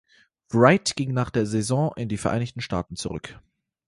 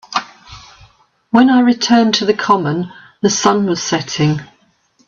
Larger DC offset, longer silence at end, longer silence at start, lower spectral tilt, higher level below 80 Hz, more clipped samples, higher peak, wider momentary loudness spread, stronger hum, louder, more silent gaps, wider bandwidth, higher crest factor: neither; about the same, 0.5 s vs 0.6 s; first, 0.5 s vs 0.1 s; about the same, -5.5 dB/octave vs -4.5 dB/octave; about the same, -50 dBFS vs -54 dBFS; neither; about the same, -2 dBFS vs 0 dBFS; about the same, 14 LU vs 12 LU; neither; second, -24 LUFS vs -14 LUFS; neither; first, 11.5 kHz vs 7.6 kHz; first, 22 dB vs 16 dB